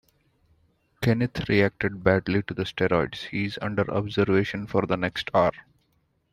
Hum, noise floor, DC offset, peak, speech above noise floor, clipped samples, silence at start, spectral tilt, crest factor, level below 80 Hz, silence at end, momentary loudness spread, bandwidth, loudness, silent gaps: none; -69 dBFS; under 0.1%; -6 dBFS; 45 dB; under 0.1%; 1 s; -7 dB/octave; 20 dB; -52 dBFS; 0.7 s; 6 LU; 15 kHz; -25 LUFS; none